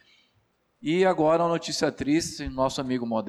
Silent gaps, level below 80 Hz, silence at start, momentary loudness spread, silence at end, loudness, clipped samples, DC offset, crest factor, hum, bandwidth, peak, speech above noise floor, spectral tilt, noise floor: none; -52 dBFS; 0.8 s; 7 LU; 0 s; -25 LUFS; under 0.1%; under 0.1%; 14 dB; none; 13.5 kHz; -12 dBFS; 44 dB; -5 dB/octave; -69 dBFS